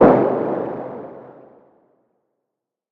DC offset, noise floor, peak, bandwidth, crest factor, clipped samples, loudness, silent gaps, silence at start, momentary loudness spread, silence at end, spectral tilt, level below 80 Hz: under 0.1%; -82 dBFS; 0 dBFS; 5.4 kHz; 20 dB; under 0.1%; -20 LUFS; none; 0 s; 22 LU; 1.6 s; -10.5 dB/octave; -52 dBFS